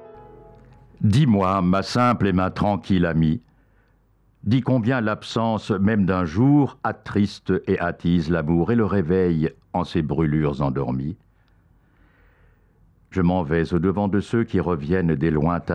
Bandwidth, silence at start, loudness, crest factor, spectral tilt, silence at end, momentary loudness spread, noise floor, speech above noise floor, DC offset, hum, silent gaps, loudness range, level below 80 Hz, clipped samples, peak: 10 kHz; 0 s; -22 LUFS; 12 dB; -8 dB/octave; 0 s; 6 LU; -60 dBFS; 39 dB; under 0.1%; none; none; 6 LU; -46 dBFS; under 0.1%; -10 dBFS